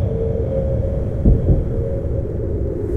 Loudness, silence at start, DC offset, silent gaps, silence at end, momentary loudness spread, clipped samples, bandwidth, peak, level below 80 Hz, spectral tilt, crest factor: -20 LUFS; 0 s; under 0.1%; none; 0 s; 6 LU; under 0.1%; 3.5 kHz; -4 dBFS; -22 dBFS; -11.5 dB/octave; 16 dB